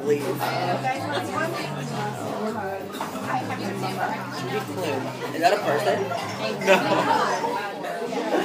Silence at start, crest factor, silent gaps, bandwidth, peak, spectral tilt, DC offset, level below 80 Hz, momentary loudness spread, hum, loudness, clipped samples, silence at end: 0 s; 24 dB; none; 15.5 kHz; -2 dBFS; -4.5 dB/octave; under 0.1%; -70 dBFS; 9 LU; none; -25 LUFS; under 0.1%; 0 s